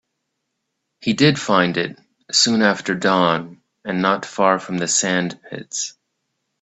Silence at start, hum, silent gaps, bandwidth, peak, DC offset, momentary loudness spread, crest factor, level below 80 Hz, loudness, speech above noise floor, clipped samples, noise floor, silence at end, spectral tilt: 1 s; none; none; 8.4 kHz; 0 dBFS; under 0.1%; 13 LU; 20 dB; -62 dBFS; -19 LUFS; 57 dB; under 0.1%; -76 dBFS; 0.7 s; -3.5 dB/octave